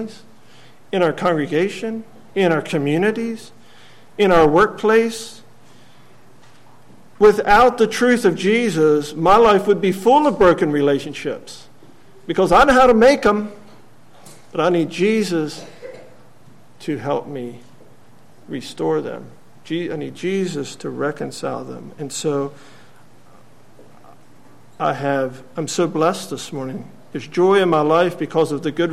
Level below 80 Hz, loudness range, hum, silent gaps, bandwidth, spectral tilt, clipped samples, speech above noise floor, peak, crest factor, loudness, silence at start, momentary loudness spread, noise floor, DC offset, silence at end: -44 dBFS; 12 LU; none; none; 15 kHz; -5.5 dB/octave; under 0.1%; 33 dB; -2 dBFS; 16 dB; -17 LUFS; 0 s; 19 LU; -50 dBFS; 0.8%; 0 s